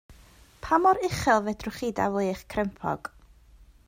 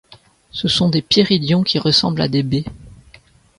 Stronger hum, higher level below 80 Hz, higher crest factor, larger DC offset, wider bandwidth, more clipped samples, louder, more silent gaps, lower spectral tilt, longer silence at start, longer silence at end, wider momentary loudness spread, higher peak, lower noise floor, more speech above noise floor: neither; about the same, -50 dBFS vs -46 dBFS; about the same, 20 dB vs 18 dB; neither; first, 16 kHz vs 11.5 kHz; neither; second, -26 LUFS vs -16 LUFS; neither; about the same, -5.5 dB/octave vs -5.5 dB/octave; about the same, 0.1 s vs 0.1 s; first, 0.8 s vs 0.65 s; about the same, 11 LU vs 9 LU; second, -8 dBFS vs 0 dBFS; first, -54 dBFS vs -49 dBFS; second, 28 dB vs 32 dB